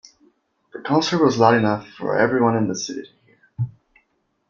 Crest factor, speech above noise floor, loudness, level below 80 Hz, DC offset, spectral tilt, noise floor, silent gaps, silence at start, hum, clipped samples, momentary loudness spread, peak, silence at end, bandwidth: 20 dB; 49 dB; -20 LUFS; -60 dBFS; under 0.1%; -5.5 dB/octave; -68 dBFS; none; 0.75 s; none; under 0.1%; 15 LU; -2 dBFS; 0.8 s; 7.6 kHz